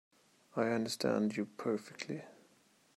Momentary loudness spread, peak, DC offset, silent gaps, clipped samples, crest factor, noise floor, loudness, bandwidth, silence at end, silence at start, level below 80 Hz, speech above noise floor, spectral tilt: 11 LU; -18 dBFS; under 0.1%; none; under 0.1%; 20 dB; -69 dBFS; -37 LUFS; 13.5 kHz; 0.65 s; 0.55 s; -84 dBFS; 33 dB; -5 dB/octave